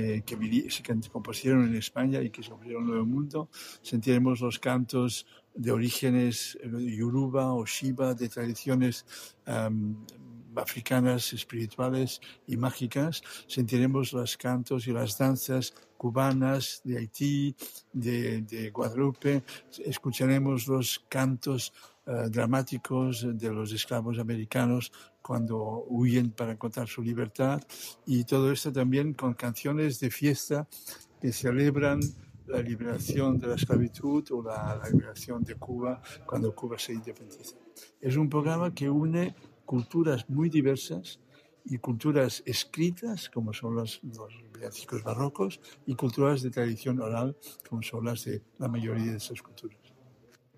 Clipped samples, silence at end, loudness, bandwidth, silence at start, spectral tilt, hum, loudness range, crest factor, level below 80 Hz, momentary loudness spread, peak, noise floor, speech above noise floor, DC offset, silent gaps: under 0.1%; 0.9 s; -30 LUFS; 15.5 kHz; 0 s; -6 dB/octave; none; 3 LU; 20 dB; -62 dBFS; 13 LU; -10 dBFS; -61 dBFS; 31 dB; under 0.1%; none